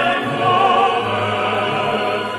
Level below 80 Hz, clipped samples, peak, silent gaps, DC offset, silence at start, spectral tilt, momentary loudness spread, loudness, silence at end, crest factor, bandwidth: -54 dBFS; under 0.1%; -4 dBFS; none; under 0.1%; 0 s; -5 dB/octave; 5 LU; -17 LUFS; 0 s; 14 dB; 13 kHz